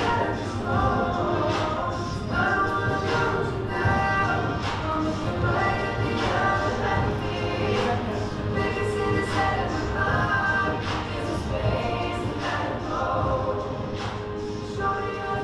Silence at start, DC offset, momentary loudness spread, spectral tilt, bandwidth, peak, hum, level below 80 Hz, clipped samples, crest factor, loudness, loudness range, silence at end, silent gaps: 0 s; under 0.1%; 6 LU; -6 dB/octave; 11.5 kHz; -10 dBFS; none; -38 dBFS; under 0.1%; 16 dB; -25 LUFS; 3 LU; 0 s; none